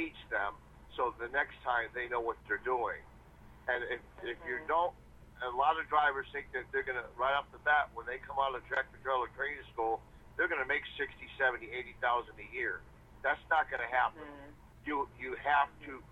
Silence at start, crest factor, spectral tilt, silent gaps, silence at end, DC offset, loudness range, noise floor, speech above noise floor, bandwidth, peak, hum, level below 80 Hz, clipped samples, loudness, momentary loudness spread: 0 s; 20 dB; -5.5 dB/octave; none; 0 s; under 0.1%; 3 LU; -56 dBFS; 21 dB; 13 kHz; -16 dBFS; none; -60 dBFS; under 0.1%; -35 LUFS; 11 LU